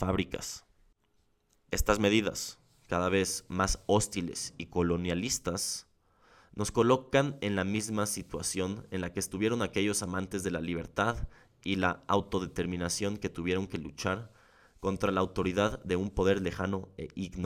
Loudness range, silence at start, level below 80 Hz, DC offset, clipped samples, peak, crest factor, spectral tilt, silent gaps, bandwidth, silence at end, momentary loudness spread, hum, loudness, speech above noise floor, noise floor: 3 LU; 0 s; -48 dBFS; under 0.1%; under 0.1%; -10 dBFS; 22 dB; -4.5 dB/octave; none; 17.5 kHz; 0 s; 10 LU; none; -32 LUFS; 40 dB; -71 dBFS